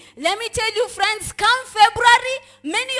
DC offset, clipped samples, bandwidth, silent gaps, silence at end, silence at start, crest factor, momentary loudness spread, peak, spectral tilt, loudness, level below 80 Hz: under 0.1%; under 0.1%; 12 kHz; none; 0 s; 0.15 s; 18 dB; 10 LU; 0 dBFS; -1 dB/octave; -17 LUFS; -48 dBFS